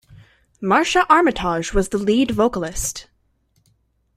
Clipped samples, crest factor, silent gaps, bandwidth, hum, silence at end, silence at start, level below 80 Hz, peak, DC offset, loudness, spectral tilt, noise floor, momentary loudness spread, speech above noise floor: under 0.1%; 18 dB; none; 16 kHz; none; 1.15 s; 0.1 s; -38 dBFS; -2 dBFS; under 0.1%; -18 LUFS; -4 dB/octave; -64 dBFS; 11 LU; 46 dB